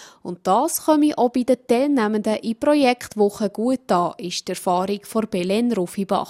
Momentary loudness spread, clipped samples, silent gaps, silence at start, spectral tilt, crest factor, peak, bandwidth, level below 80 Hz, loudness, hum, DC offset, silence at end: 7 LU; under 0.1%; none; 0 s; -5 dB/octave; 16 dB; -4 dBFS; 16 kHz; -62 dBFS; -21 LUFS; none; under 0.1%; 0 s